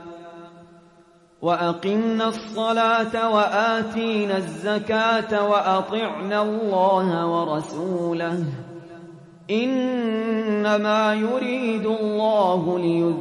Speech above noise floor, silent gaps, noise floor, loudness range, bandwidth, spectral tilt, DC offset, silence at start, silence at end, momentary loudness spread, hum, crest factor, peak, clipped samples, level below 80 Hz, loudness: 32 dB; none; -54 dBFS; 3 LU; 11 kHz; -6 dB/octave; under 0.1%; 0 s; 0 s; 8 LU; none; 16 dB; -8 dBFS; under 0.1%; -68 dBFS; -22 LUFS